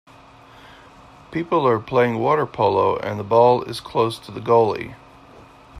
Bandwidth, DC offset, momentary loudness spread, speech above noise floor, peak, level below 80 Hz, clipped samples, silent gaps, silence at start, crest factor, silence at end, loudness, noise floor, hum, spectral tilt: 13.5 kHz; under 0.1%; 13 LU; 28 dB; -2 dBFS; -56 dBFS; under 0.1%; none; 1.3 s; 18 dB; 0 s; -20 LUFS; -46 dBFS; none; -7 dB/octave